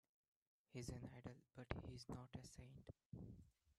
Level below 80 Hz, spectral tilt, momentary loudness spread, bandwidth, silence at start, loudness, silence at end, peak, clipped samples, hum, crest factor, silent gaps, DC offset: -68 dBFS; -5.5 dB/octave; 9 LU; 13 kHz; 0.7 s; -57 LUFS; 0.05 s; -26 dBFS; under 0.1%; none; 30 dB; 3.05-3.10 s; under 0.1%